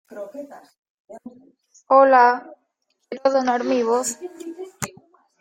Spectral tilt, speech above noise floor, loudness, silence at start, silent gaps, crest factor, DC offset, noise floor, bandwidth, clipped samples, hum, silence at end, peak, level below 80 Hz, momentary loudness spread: -3.5 dB/octave; 52 dB; -18 LUFS; 0.1 s; 0.78-0.83 s, 0.90-1.08 s; 20 dB; under 0.1%; -72 dBFS; 16 kHz; under 0.1%; none; 0.55 s; -2 dBFS; -68 dBFS; 24 LU